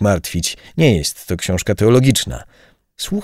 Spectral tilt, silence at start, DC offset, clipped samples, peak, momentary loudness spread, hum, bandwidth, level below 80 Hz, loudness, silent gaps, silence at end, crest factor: -5 dB/octave; 0 s; under 0.1%; under 0.1%; 0 dBFS; 12 LU; none; 16 kHz; -36 dBFS; -16 LUFS; none; 0 s; 16 dB